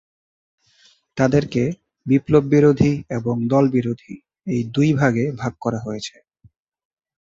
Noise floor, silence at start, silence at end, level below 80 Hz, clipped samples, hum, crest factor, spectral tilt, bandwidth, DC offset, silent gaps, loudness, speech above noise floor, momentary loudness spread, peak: -57 dBFS; 1.15 s; 1.15 s; -50 dBFS; under 0.1%; none; 18 dB; -7.5 dB/octave; 7.8 kHz; under 0.1%; none; -19 LUFS; 38 dB; 16 LU; -2 dBFS